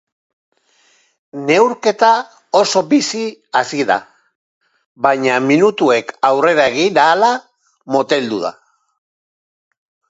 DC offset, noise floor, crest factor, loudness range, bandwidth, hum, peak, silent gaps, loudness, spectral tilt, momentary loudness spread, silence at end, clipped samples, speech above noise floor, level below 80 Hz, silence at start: under 0.1%; -56 dBFS; 16 dB; 3 LU; 8 kHz; none; 0 dBFS; 4.35-4.61 s, 4.86-4.95 s; -14 LUFS; -4 dB/octave; 8 LU; 1.6 s; under 0.1%; 42 dB; -66 dBFS; 1.35 s